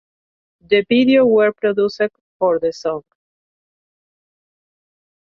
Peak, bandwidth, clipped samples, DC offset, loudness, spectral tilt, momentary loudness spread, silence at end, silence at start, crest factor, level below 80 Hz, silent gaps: -4 dBFS; 7 kHz; under 0.1%; under 0.1%; -17 LUFS; -6 dB/octave; 11 LU; 2.3 s; 0.7 s; 16 dB; -62 dBFS; 2.21-2.40 s